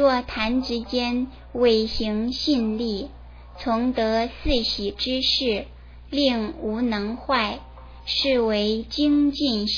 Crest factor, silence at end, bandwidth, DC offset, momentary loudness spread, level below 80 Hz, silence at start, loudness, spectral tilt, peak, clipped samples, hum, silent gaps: 16 dB; 0 s; 5.4 kHz; under 0.1%; 8 LU; -40 dBFS; 0 s; -23 LUFS; -5 dB/octave; -8 dBFS; under 0.1%; 60 Hz at -40 dBFS; none